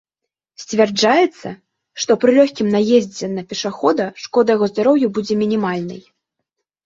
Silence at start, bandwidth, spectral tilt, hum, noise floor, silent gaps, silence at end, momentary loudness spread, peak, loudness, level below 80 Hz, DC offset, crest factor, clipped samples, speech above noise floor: 0.6 s; 7.8 kHz; -5 dB/octave; none; -82 dBFS; none; 0.85 s; 14 LU; -2 dBFS; -17 LUFS; -62 dBFS; under 0.1%; 16 dB; under 0.1%; 66 dB